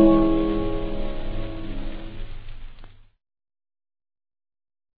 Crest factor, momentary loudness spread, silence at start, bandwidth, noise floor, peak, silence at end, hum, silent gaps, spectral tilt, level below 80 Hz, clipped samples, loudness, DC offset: 20 dB; 23 LU; 0 s; 4.8 kHz; -43 dBFS; -4 dBFS; 2.05 s; none; none; -11 dB/octave; -32 dBFS; under 0.1%; -25 LUFS; under 0.1%